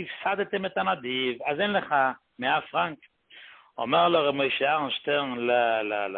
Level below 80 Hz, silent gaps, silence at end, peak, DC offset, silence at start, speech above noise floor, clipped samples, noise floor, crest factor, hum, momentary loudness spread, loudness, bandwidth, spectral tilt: -68 dBFS; none; 0 s; -10 dBFS; under 0.1%; 0 s; 25 dB; under 0.1%; -51 dBFS; 18 dB; none; 6 LU; -26 LUFS; 4.5 kHz; -8.5 dB/octave